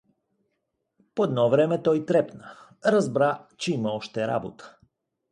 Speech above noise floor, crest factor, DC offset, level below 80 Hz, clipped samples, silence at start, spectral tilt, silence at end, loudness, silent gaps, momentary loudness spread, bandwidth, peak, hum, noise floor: 54 dB; 18 dB; under 0.1%; -68 dBFS; under 0.1%; 1.15 s; -6.5 dB/octave; 0.65 s; -25 LUFS; none; 11 LU; 11 kHz; -8 dBFS; none; -78 dBFS